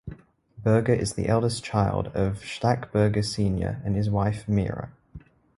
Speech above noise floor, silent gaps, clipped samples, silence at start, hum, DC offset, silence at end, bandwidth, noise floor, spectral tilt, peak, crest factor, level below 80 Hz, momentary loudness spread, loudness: 24 dB; none; under 0.1%; 0.05 s; none; under 0.1%; 0.4 s; 11.5 kHz; -48 dBFS; -6.5 dB/octave; -6 dBFS; 18 dB; -44 dBFS; 6 LU; -25 LUFS